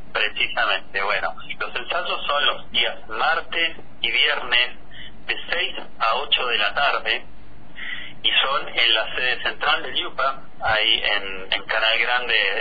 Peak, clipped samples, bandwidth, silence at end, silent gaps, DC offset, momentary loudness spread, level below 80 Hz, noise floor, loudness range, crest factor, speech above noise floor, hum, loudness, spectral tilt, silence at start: -4 dBFS; under 0.1%; 5 kHz; 0 s; none; 4%; 10 LU; -48 dBFS; -43 dBFS; 2 LU; 18 dB; 20 dB; none; -21 LUFS; -3.5 dB/octave; 0 s